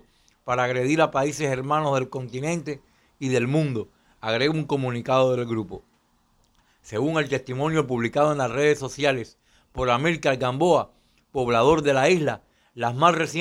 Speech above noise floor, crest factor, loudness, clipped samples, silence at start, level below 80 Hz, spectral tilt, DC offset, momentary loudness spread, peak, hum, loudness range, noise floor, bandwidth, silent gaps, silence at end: 42 dB; 20 dB; -23 LUFS; under 0.1%; 0.45 s; -54 dBFS; -5.5 dB/octave; under 0.1%; 13 LU; -4 dBFS; none; 4 LU; -64 dBFS; 13.5 kHz; none; 0 s